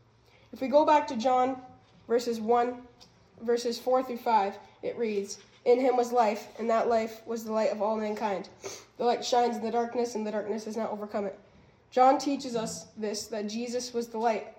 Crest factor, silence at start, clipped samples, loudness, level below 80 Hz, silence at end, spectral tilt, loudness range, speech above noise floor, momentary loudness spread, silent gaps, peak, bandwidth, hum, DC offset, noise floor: 18 dB; 0.55 s; under 0.1%; -29 LUFS; -72 dBFS; 0.1 s; -4 dB/octave; 3 LU; 32 dB; 12 LU; none; -10 dBFS; 17 kHz; none; under 0.1%; -60 dBFS